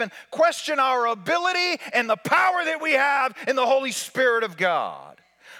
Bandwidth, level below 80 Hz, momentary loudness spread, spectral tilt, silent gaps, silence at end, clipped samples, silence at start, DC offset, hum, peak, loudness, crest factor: 18 kHz; -84 dBFS; 5 LU; -2.5 dB/octave; none; 0 s; under 0.1%; 0 s; under 0.1%; none; -8 dBFS; -22 LUFS; 16 dB